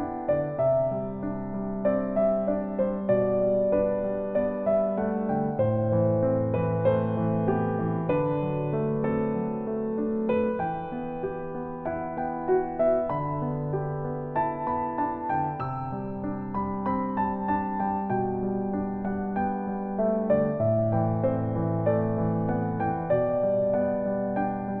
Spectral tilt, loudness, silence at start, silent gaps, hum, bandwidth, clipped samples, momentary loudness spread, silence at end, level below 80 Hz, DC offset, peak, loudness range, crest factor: -12.5 dB/octave; -27 LUFS; 0 s; none; none; 4.3 kHz; under 0.1%; 7 LU; 0 s; -50 dBFS; under 0.1%; -12 dBFS; 4 LU; 16 dB